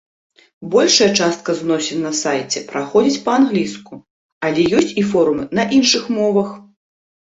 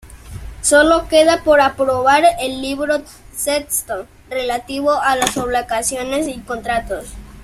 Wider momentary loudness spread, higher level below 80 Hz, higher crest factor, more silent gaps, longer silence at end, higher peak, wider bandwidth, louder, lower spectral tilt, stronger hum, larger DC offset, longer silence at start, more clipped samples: second, 9 LU vs 15 LU; second, -56 dBFS vs -40 dBFS; about the same, 16 dB vs 16 dB; first, 4.10-4.41 s vs none; first, 0.6 s vs 0 s; about the same, 0 dBFS vs 0 dBFS; second, 8.2 kHz vs 15.5 kHz; about the same, -16 LUFS vs -16 LUFS; about the same, -3.5 dB/octave vs -2.5 dB/octave; neither; neither; first, 0.6 s vs 0.05 s; neither